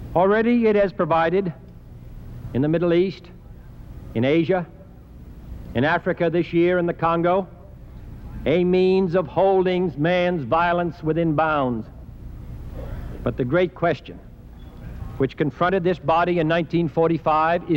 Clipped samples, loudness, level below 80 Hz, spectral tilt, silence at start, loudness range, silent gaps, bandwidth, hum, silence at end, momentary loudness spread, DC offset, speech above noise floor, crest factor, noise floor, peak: under 0.1%; -21 LUFS; -42 dBFS; -8.5 dB/octave; 0 s; 5 LU; none; 15 kHz; none; 0 s; 21 LU; under 0.1%; 22 dB; 16 dB; -42 dBFS; -6 dBFS